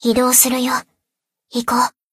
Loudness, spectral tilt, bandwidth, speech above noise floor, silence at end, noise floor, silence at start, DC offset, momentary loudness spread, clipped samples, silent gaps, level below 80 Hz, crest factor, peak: -15 LUFS; -1.5 dB/octave; 16 kHz; 65 dB; 0.25 s; -81 dBFS; 0 s; under 0.1%; 12 LU; under 0.1%; none; -52 dBFS; 18 dB; 0 dBFS